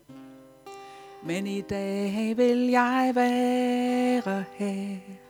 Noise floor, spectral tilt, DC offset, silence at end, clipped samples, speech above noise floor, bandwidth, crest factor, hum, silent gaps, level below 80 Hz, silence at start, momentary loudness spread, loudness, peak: -48 dBFS; -6 dB/octave; under 0.1%; 0.1 s; under 0.1%; 23 dB; 17 kHz; 18 dB; 50 Hz at -65 dBFS; none; -64 dBFS; 0.1 s; 20 LU; -26 LUFS; -8 dBFS